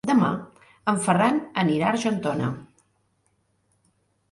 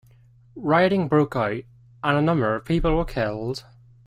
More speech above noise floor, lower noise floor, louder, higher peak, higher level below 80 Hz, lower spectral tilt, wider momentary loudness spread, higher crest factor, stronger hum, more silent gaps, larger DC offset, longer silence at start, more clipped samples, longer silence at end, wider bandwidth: first, 46 dB vs 31 dB; first, -69 dBFS vs -53 dBFS; about the same, -24 LUFS vs -23 LUFS; about the same, -8 dBFS vs -6 dBFS; second, -64 dBFS vs -38 dBFS; second, -5.5 dB/octave vs -7.5 dB/octave; about the same, 10 LU vs 12 LU; about the same, 18 dB vs 18 dB; neither; neither; neither; second, 0.05 s vs 0.55 s; neither; first, 1.65 s vs 0.45 s; second, 11.5 kHz vs 13.5 kHz